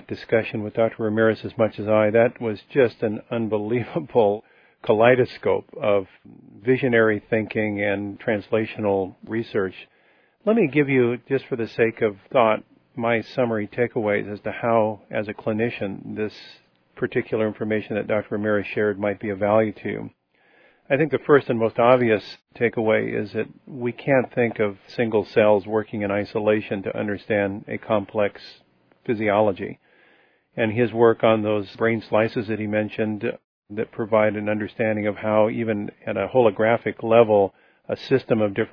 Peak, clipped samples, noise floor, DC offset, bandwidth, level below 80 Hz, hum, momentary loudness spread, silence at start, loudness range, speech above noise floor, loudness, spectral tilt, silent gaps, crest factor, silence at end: -2 dBFS; under 0.1%; -60 dBFS; under 0.1%; 5.4 kHz; -62 dBFS; none; 12 LU; 0.1 s; 4 LU; 38 dB; -22 LUFS; -9 dB/octave; 33.44-33.62 s; 20 dB; 0.05 s